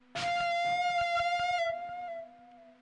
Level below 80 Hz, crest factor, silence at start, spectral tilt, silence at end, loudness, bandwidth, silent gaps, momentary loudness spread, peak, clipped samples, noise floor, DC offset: -66 dBFS; 8 dB; 0.15 s; -2 dB/octave; 0.1 s; -31 LUFS; 10.5 kHz; none; 13 LU; -24 dBFS; under 0.1%; -56 dBFS; under 0.1%